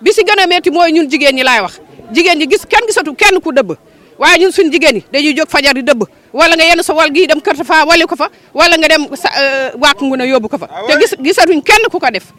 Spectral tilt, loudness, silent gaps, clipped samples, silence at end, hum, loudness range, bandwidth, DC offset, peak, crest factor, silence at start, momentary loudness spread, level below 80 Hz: -2 dB/octave; -9 LUFS; none; 0.2%; 0.2 s; none; 2 LU; 16.5 kHz; under 0.1%; 0 dBFS; 10 dB; 0 s; 7 LU; -42 dBFS